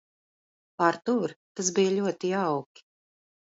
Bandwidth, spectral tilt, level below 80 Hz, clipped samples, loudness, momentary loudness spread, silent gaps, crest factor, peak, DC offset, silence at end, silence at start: 8 kHz; -4.5 dB/octave; -76 dBFS; under 0.1%; -27 LUFS; 6 LU; 1.36-1.55 s; 22 dB; -8 dBFS; under 0.1%; 0.95 s; 0.8 s